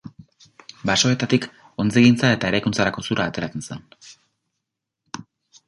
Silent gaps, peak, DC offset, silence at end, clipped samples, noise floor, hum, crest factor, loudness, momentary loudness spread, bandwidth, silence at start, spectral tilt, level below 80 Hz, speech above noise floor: none; -2 dBFS; under 0.1%; 0.45 s; under 0.1%; -82 dBFS; none; 20 dB; -20 LUFS; 22 LU; 11.5 kHz; 0.05 s; -4.5 dB/octave; -52 dBFS; 62 dB